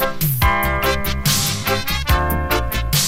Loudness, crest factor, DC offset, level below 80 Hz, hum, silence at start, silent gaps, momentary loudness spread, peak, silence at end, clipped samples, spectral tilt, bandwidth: -18 LUFS; 14 dB; under 0.1%; -26 dBFS; none; 0 s; none; 3 LU; -4 dBFS; 0 s; under 0.1%; -3.5 dB/octave; 16.5 kHz